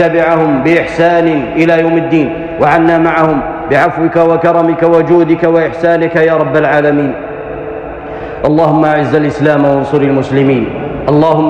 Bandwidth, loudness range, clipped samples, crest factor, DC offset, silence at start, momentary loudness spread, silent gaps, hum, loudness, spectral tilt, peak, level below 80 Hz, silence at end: 8.4 kHz; 3 LU; under 0.1%; 10 dB; under 0.1%; 0 s; 8 LU; none; none; -10 LUFS; -8 dB/octave; 0 dBFS; -38 dBFS; 0 s